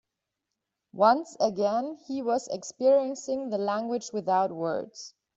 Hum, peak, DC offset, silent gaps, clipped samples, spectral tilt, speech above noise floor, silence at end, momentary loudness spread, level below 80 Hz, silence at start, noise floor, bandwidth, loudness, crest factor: none; -8 dBFS; under 0.1%; none; under 0.1%; -5 dB/octave; 58 dB; 0.3 s; 11 LU; -74 dBFS; 0.95 s; -85 dBFS; 8 kHz; -27 LUFS; 20 dB